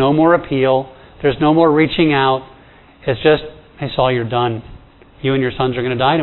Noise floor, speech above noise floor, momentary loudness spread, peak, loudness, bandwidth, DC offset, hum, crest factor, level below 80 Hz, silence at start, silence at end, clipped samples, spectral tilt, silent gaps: -44 dBFS; 29 dB; 11 LU; 0 dBFS; -16 LUFS; 4.2 kHz; under 0.1%; none; 16 dB; -42 dBFS; 0 s; 0 s; under 0.1%; -10 dB/octave; none